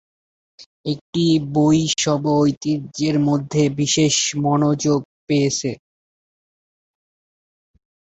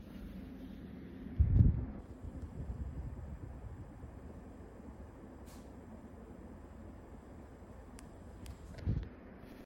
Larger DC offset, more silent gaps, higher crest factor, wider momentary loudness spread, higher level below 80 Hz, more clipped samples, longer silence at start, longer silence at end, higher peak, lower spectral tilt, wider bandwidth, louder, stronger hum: neither; first, 0.66-0.84 s, 1.01-1.13 s, 2.57-2.61 s, 5.05-5.27 s vs none; second, 16 dB vs 26 dB; second, 8 LU vs 19 LU; second, -56 dBFS vs -44 dBFS; neither; first, 0.6 s vs 0 s; first, 2.45 s vs 0 s; first, -4 dBFS vs -14 dBFS; second, -5 dB/octave vs -9 dB/octave; second, 8.2 kHz vs 16.5 kHz; first, -19 LUFS vs -40 LUFS; neither